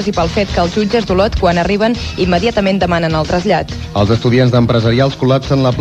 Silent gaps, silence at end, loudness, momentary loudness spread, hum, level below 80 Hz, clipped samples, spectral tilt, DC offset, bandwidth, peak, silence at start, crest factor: none; 0 s; -13 LUFS; 4 LU; none; -28 dBFS; under 0.1%; -6.5 dB/octave; 0.1%; 9.2 kHz; 0 dBFS; 0 s; 12 dB